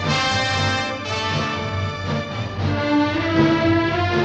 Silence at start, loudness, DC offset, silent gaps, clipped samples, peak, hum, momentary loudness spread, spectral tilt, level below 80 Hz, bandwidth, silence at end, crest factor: 0 s; -20 LUFS; under 0.1%; none; under 0.1%; -4 dBFS; none; 8 LU; -5.5 dB/octave; -44 dBFS; 8.8 kHz; 0 s; 16 dB